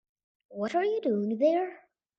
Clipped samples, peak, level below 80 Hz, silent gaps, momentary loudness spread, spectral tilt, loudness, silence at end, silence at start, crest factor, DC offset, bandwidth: under 0.1%; -14 dBFS; -82 dBFS; none; 11 LU; -7 dB/octave; -29 LUFS; 0.4 s; 0.5 s; 16 dB; under 0.1%; 7.8 kHz